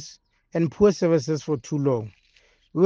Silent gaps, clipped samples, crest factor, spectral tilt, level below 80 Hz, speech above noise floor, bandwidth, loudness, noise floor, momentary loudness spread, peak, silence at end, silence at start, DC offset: none; under 0.1%; 18 dB; -7 dB/octave; -56 dBFS; 39 dB; 7.6 kHz; -24 LUFS; -61 dBFS; 13 LU; -6 dBFS; 0 s; 0 s; under 0.1%